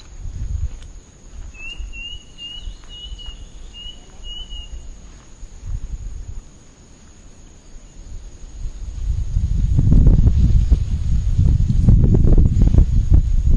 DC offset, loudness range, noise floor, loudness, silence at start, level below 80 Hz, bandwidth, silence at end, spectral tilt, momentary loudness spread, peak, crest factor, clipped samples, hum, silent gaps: under 0.1%; 21 LU; -43 dBFS; -18 LUFS; 0.05 s; -20 dBFS; 7.4 kHz; 0 s; -7.5 dB/octave; 24 LU; -4 dBFS; 14 dB; under 0.1%; none; none